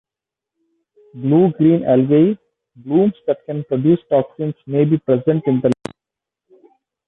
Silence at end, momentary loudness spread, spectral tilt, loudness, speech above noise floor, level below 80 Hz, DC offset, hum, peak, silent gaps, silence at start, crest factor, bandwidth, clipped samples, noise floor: 1.35 s; 11 LU; -10 dB/octave; -17 LUFS; 71 dB; -58 dBFS; under 0.1%; none; -2 dBFS; none; 1.15 s; 16 dB; 7.8 kHz; under 0.1%; -86 dBFS